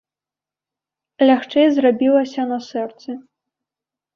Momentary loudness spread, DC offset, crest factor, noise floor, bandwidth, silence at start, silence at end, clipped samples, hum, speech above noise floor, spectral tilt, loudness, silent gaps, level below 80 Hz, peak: 17 LU; under 0.1%; 16 dB; -89 dBFS; 6.8 kHz; 1.2 s; 0.95 s; under 0.1%; none; 73 dB; -5.5 dB/octave; -17 LUFS; none; -68 dBFS; -4 dBFS